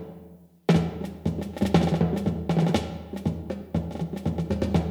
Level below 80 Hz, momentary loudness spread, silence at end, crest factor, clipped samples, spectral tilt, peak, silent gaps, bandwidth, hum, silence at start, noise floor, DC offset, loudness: -42 dBFS; 9 LU; 0 s; 20 dB; under 0.1%; -7.5 dB/octave; -6 dBFS; none; 13.5 kHz; none; 0 s; -49 dBFS; under 0.1%; -27 LUFS